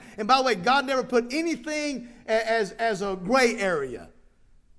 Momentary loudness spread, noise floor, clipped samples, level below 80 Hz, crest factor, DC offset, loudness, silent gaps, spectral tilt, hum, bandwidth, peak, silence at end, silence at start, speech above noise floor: 9 LU; -56 dBFS; under 0.1%; -54 dBFS; 20 dB; under 0.1%; -24 LUFS; none; -3.5 dB/octave; none; 11 kHz; -6 dBFS; 0.7 s; 0 s; 31 dB